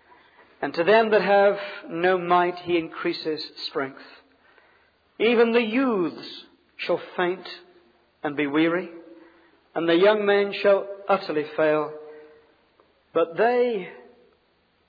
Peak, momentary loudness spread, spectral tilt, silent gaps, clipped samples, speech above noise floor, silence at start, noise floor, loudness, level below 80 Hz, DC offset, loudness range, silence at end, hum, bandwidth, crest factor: -6 dBFS; 15 LU; -7.5 dB/octave; none; under 0.1%; 43 dB; 0.6 s; -65 dBFS; -23 LUFS; -74 dBFS; under 0.1%; 5 LU; 0.9 s; none; 5 kHz; 18 dB